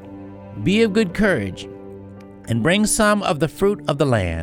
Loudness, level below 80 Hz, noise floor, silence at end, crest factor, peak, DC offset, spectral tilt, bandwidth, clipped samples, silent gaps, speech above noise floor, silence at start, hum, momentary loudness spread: -19 LUFS; -40 dBFS; -39 dBFS; 0 s; 18 dB; -2 dBFS; under 0.1%; -5 dB/octave; 16.5 kHz; under 0.1%; none; 21 dB; 0 s; none; 21 LU